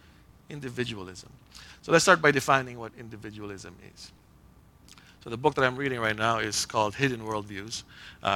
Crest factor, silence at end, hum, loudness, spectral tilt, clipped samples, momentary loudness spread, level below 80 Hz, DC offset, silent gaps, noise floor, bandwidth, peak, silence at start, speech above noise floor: 26 dB; 0 s; none; -26 LUFS; -3.5 dB/octave; under 0.1%; 25 LU; -58 dBFS; under 0.1%; none; -56 dBFS; 17.5 kHz; -4 dBFS; 0.5 s; 28 dB